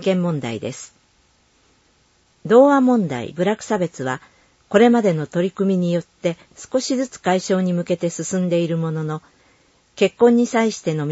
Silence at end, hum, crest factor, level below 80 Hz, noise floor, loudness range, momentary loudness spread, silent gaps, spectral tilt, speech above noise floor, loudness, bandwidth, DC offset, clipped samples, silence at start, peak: 0 s; none; 18 dB; -62 dBFS; -59 dBFS; 4 LU; 13 LU; none; -6 dB/octave; 41 dB; -19 LUFS; 8 kHz; under 0.1%; under 0.1%; 0 s; -2 dBFS